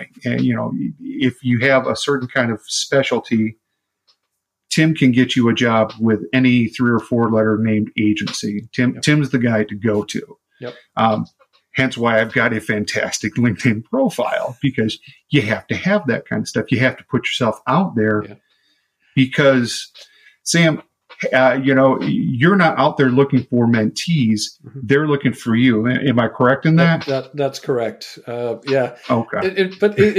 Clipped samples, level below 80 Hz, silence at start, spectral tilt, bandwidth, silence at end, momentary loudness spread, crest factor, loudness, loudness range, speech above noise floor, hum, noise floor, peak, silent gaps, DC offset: under 0.1%; -58 dBFS; 0 s; -5.5 dB/octave; 14 kHz; 0 s; 10 LU; 16 dB; -17 LUFS; 4 LU; 59 dB; none; -76 dBFS; -2 dBFS; none; under 0.1%